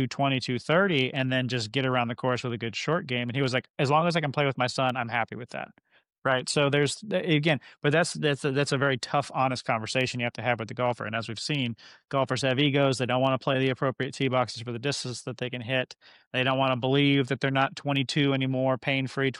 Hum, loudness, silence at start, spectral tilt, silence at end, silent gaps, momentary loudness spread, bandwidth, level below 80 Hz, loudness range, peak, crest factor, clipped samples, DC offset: none; -27 LUFS; 0 s; -5 dB/octave; 0 s; 3.70-3.74 s, 6.18-6.22 s, 16.27-16.31 s; 8 LU; 11.5 kHz; -66 dBFS; 2 LU; -10 dBFS; 16 dB; under 0.1%; under 0.1%